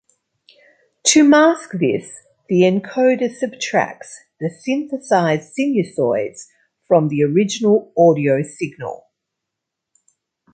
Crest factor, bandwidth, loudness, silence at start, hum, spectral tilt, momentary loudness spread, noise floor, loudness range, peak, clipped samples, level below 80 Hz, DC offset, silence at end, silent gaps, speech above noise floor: 18 dB; 9.6 kHz; -17 LUFS; 1.05 s; none; -5 dB/octave; 15 LU; -81 dBFS; 4 LU; 0 dBFS; under 0.1%; -66 dBFS; under 0.1%; 1.6 s; none; 64 dB